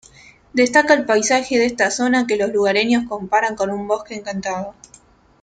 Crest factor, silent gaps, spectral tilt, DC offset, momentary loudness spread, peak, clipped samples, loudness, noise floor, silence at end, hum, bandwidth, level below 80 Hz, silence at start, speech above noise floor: 18 dB; none; -3 dB/octave; under 0.1%; 11 LU; -2 dBFS; under 0.1%; -18 LUFS; -47 dBFS; 0.7 s; none; 9.4 kHz; -56 dBFS; 0.55 s; 29 dB